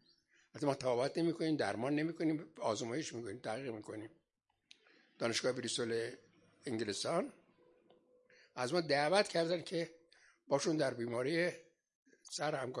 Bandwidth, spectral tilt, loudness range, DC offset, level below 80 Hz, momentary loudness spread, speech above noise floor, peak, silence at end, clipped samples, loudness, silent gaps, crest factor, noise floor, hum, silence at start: 11.5 kHz; -4.5 dB/octave; 5 LU; under 0.1%; -84 dBFS; 13 LU; 47 dB; -16 dBFS; 0 s; under 0.1%; -37 LUFS; 11.95-12.03 s; 24 dB; -84 dBFS; none; 0.55 s